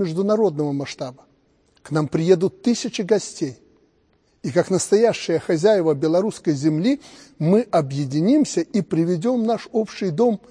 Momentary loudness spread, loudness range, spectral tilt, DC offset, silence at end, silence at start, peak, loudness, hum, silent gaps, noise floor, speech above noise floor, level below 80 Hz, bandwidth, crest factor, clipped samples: 9 LU; 4 LU; -6 dB/octave; under 0.1%; 0.15 s; 0 s; -2 dBFS; -20 LUFS; none; none; -62 dBFS; 42 dB; -64 dBFS; 10.5 kHz; 18 dB; under 0.1%